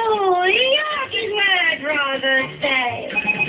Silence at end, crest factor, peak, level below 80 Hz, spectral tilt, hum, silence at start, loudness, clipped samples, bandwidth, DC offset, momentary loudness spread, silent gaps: 0 s; 14 dB; -4 dBFS; -56 dBFS; -6 dB/octave; none; 0 s; -17 LUFS; under 0.1%; 4 kHz; under 0.1%; 6 LU; none